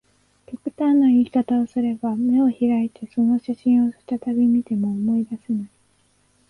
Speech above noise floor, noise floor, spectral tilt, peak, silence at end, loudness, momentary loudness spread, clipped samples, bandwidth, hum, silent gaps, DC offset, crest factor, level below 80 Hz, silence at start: 42 dB; -62 dBFS; -9 dB/octave; -10 dBFS; 0.85 s; -21 LUFS; 11 LU; under 0.1%; 4.2 kHz; none; none; under 0.1%; 10 dB; -62 dBFS; 0.5 s